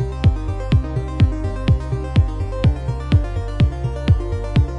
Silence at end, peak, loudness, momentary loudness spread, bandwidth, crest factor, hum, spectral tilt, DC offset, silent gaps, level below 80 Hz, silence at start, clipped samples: 0 s; -4 dBFS; -20 LUFS; 4 LU; 9.4 kHz; 14 dB; none; -8.5 dB/octave; under 0.1%; none; -24 dBFS; 0 s; under 0.1%